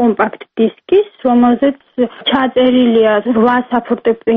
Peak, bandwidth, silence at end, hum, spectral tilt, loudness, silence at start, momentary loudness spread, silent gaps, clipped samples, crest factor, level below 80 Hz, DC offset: -2 dBFS; 3.9 kHz; 0 s; none; -3 dB/octave; -13 LUFS; 0 s; 6 LU; none; under 0.1%; 12 dB; -52 dBFS; under 0.1%